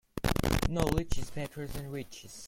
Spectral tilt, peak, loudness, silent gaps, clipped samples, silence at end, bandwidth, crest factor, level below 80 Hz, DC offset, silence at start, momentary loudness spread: -5.5 dB/octave; -12 dBFS; -33 LUFS; none; under 0.1%; 0 s; 17 kHz; 20 dB; -40 dBFS; under 0.1%; 0.15 s; 11 LU